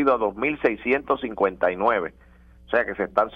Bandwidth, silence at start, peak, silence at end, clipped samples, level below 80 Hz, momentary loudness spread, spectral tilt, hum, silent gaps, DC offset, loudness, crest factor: 6 kHz; 0 s; -6 dBFS; 0 s; under 0.1%; -52 dBFS; 4 LU; -7.5 dB/octave; none; none; under 0.1%; -23 LUFS; 18 dB